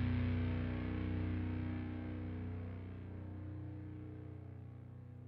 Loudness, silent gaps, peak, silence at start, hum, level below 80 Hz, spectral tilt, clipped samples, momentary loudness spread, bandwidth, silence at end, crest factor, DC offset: -43 LUFS; none; -28 dBFS; 0 s; none; -54 dBFS; -8 dB/octave; under 0.1%; 14 LU; 4.9 kHz; 0 s; 14 dB; under 0.1%